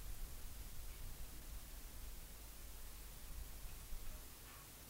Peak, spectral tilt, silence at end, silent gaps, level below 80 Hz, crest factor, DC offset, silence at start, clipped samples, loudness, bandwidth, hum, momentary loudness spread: -34 dBFS; -3 dB/octave; 0 s; none; -52 dBFS; 16 dB; under 0.1%; 0 s; under 0.1%; -55 LUFS; 16 kHz; none; 2 LU